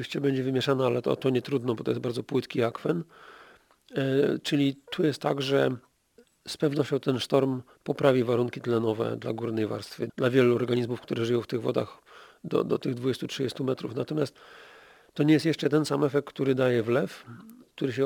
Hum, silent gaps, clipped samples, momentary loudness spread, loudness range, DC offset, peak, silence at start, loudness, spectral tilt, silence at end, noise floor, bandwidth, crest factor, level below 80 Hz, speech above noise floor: none; none; under 0.1%; 10 LU; 3 LU; under 0.1%; -6 dBFS; 0 s; -27 LUFS; -6.5 dB/octave; 0 s; -62 dBFS; 18.5 kHz; 22 dB; -70 dBFS; 35 dB